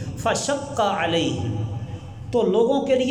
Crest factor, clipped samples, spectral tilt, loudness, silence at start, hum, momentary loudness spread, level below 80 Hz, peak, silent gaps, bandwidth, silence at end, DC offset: 14 dB; under 0.1%; -5 dB/octave; -23 LUFS; 0 s; none; 11 LU; -48 dBFS; -8 dBFS; none; 15.5 kHz; 0 s; under 0.1%